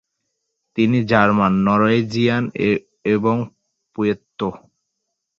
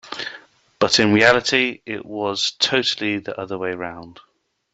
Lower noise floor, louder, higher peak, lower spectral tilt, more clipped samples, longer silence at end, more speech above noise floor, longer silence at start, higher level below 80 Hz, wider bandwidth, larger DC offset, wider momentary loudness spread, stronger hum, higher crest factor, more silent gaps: first, -77 dBFS vs -45 dBFS; about the same, -18 LUFS vs -19 LUFS; about the same, -2 dBFS vs -2 dBFS; first, -7.5 dB/octave vs -3 dB/octave; neither; first, 0.8 s vs 0.55 s; first, 59 dB vs 25 dB; first, 0.75 s vs 0.05 s; first, -52 dBFS vs -58 dBFS; second, 7.2 kHz vs 8.2 kHz; neither; second, 12 LU vs 16 LU; neither; about the same, 18 dB vs 20 dB; neither